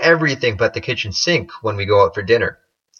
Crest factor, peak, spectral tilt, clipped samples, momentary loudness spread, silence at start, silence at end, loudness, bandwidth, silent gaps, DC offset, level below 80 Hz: 18 dB; 0 dBFS; -4.5 dB/octave; under 0.1%; 8 LU; 0 s; 0.5 s; -17 LUFS; 7 kHz; none; under 0.1%; -50 dBFS